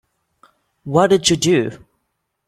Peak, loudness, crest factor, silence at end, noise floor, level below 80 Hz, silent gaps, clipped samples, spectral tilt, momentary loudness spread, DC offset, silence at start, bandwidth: 0 dBFS; -16 LUFS; 18 dB; 0.7 s; -73 dBFS; -52 dBFS; none; under 0.1%; -4 dB/octave; 13 LU; under 0.1%; 0.85 s; 15 kHz